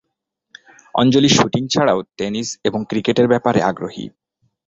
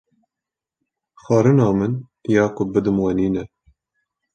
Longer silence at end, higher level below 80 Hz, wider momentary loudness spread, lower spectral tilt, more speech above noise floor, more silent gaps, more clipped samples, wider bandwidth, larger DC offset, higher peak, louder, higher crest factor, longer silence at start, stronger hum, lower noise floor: second, 0.6 s vs 0.9 s; about the same, -52 dBFS vs -50 dBFS; about the same, 13 LU vs 11 LU; second, -4.5 dB/octave vs -8.5 dB/octave; second, 59 dB vs 69 dB; neither; neither; second, 7.8 kHz vs 8.8 kHz; neither; about the same, 0 dBFS vs -2 dBFS; about the same, -17 LUFS vs -19 LUFS; about the same, 18 dB vs 18 dB; second, 0.95 s vs 1.3 s; neither; second, -76 dBFS vs -87 dBFS